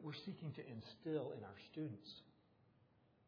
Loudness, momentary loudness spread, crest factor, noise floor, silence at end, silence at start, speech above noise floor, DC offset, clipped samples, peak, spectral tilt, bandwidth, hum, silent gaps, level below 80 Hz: -50 LUFS; 10 LU; 18 dB; -74 dBFS; 0.4 s; 0 s; 25 dB; under 0.1%; under 0.1%; -32 dBFS; -6 dB/octave; 5.4 kHz; none; none; -86 dBFS